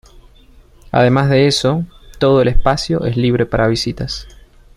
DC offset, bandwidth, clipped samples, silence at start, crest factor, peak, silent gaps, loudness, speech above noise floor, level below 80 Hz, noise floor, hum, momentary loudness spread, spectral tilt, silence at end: under 0.1%; 12.5 kHz; under 0.1%; 0.15 s; 14 dB; -2 dBFS; none; -15 LUFS; 31 dB; -28 dBFS; -44 dBFS; none; 11 LU; -6 dB/octave; 0.45 s